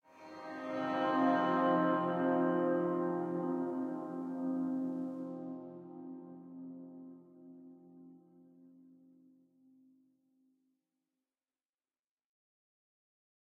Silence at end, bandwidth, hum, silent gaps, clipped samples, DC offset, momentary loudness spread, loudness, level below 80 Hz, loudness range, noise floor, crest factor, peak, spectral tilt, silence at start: 4.8 s; 6.6 kHz; none; none; under 0.1%; under 0.1%; 23 LU; -35 LUFS; under -90 dBFS; 21 LU; under -90 dBFS; 18 dB; -20 dBFS; -8 dB/octave; 0.15 s